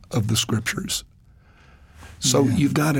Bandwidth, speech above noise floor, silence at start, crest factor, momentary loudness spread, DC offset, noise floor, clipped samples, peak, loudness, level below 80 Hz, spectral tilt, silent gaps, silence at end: 17 kHz; 31 dB; 0.1 s; 16 dB; 8 LU; under 0.1%; -52 dBFS; under 0.1%; -6 dBFS; -22 LUFS; -48 dBFS; -4.5 dB/octave; none; 0 s